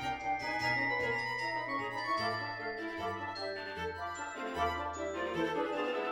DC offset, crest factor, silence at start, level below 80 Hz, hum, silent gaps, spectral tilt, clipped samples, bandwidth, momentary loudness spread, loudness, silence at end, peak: under 0.1%; 14 dB; 0 s; -60 dBFS; none; none; -4.5 dB/octave; under 0.1%; 19.5 kHz; 7 LU; -35 LUFS; 0 s; -22 dBFS